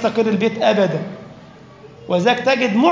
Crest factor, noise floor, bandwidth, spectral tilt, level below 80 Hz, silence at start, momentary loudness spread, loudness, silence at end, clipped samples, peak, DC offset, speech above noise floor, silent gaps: 16 dB; -41 dBFS; 7.6 kHz; -6 dB/octave; -60 dBFS; 0 s; 11 LU; -17 LUFS; 0 s; under 0.1%; -2 dBFS; under 0.1%; 25 dB; none